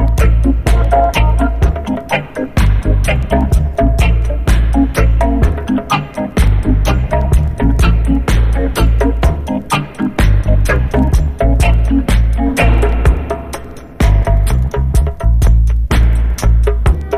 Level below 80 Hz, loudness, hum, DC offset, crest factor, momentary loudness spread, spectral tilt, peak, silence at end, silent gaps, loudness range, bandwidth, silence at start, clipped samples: -12 dBFS; -14 LUFS; none; under 0.1%; 10 dB; 5 LU; -6.5 dB/octave; 0 dBFS; 0 s; none; 1 LU; 13.5 kHz; 0 s; under 0.1%